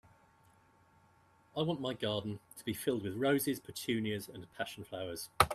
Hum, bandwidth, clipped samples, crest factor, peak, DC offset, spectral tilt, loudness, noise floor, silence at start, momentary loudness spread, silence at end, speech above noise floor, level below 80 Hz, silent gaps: none; 14.5 kHz; under 0.1%; 28 dB; -8 dBFS; under 0.1%; -4.5 dB/octave; -37 LUFS; -67 dBFS; 1.55 s; 11 LU; 0 s; 31 dB; -62 dBFS; none